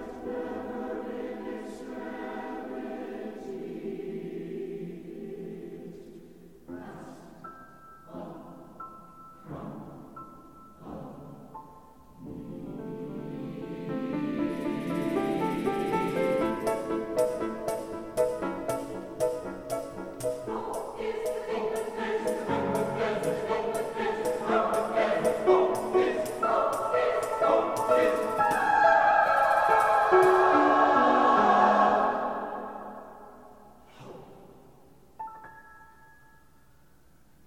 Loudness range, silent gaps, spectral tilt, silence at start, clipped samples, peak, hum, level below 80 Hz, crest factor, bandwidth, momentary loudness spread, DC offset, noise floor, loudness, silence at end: 23 LU; none; -5.5 dB/octave; 0 s; under 0.1%; -8 dBFS; none; -60 dBFS; 22 dB; 16 kHz; 24 LU; 0.1%; -61 dBFS; -27 LUFS; 1.6 s